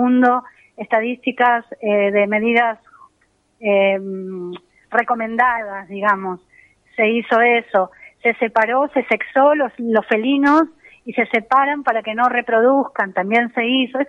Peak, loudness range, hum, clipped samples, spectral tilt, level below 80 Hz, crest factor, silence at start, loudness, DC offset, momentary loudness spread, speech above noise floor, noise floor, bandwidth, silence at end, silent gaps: -2 dBFS; 3 LU; none; under 0.1%; -6.5 dB/octave; -64 dBFS; 14 dB; 0 s; -17 LUFS; under 0.1%; 12 LU; 45 dB; -62 dBFS; 7.4 kHz; 0.05 s; none